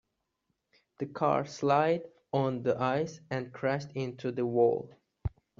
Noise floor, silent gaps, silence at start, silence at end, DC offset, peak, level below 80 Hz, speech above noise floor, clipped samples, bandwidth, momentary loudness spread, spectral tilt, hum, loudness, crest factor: -81 dBFS; none; 1 s; 0.3 s; under 0.1%; -12 dBFS; -58 dBFS; 51 dB; under 0.1%; 7.4 kHz; 14 LU; -6 dB/octave; none; -31 LUFS; 18 dB